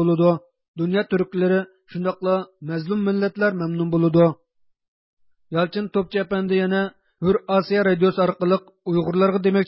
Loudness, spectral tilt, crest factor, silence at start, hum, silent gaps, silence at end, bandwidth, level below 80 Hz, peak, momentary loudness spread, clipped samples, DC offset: -21 LUFS; -12 dB/octave; 16 dB; 0 s; none; 0.68-0.74 s, 4.88-5.17 s; 0 s; 5.8 kHz; -56 dBFS; -6 dBFS; 9 LU; under 0.1%; under 0.1%